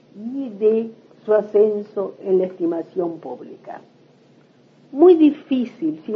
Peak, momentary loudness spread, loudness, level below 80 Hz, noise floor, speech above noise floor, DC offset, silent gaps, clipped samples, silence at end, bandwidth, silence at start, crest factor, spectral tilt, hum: -2 dBFS; 22 LU; -19 LUFS; -78 dBFS; -53 dBFS; 34 dB; under 0.1%; none; under 0.1%; 0 s; 5 kHz; 0.15 s; 18 dB; -9 dB/octave; none